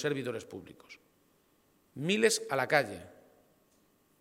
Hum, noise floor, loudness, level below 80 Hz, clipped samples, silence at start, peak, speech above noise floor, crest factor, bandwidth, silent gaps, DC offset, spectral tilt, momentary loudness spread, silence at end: none; -69 dBFS; -31 LUFS; -76 dBFS; under 0.1%; 0 s; -10 dBFS; 37 dB; 24 dB; 16.5 kHz; none; under 0.1%; -3.5 dB/octave; 24 LU; 1.1 s